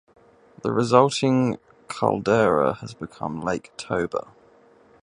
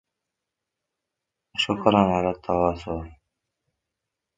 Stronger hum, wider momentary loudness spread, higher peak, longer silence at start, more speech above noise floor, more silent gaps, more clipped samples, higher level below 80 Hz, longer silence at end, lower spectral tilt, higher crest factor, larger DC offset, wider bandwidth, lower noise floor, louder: neither; about the same, 15 LU vs 15 LU; about the same, 0 dBFS vs 0 dBFS; second, 0.65 s vs 1.55 s; second, 32 dB vs 62 dB; neither; neither; second, -56 dBFS vs -48 dBFS; second, 0.8 s vs 1.25 s; about the same, -6 dB/octave vs -6 dB/octave; about the same, 22 dB vs 26 dB; neither; first, 11 kHz vs 9.2 kHz; second, -54 dBFS vs -84 dBFS; about the same, -23 LUFS vs -23 LUFS